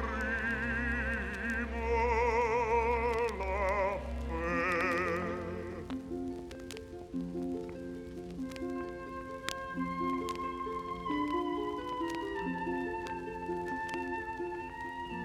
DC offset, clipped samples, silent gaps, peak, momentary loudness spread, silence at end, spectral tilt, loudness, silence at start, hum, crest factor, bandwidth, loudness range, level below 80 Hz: under 0.1%; under 0.1%; none; -14 dBFS; 11 LU; 0 s; -6 dB/octave; -35 LUFS; 0 s; none; 22 dB; 15.5 kHz; 9 LU; -46 dBFS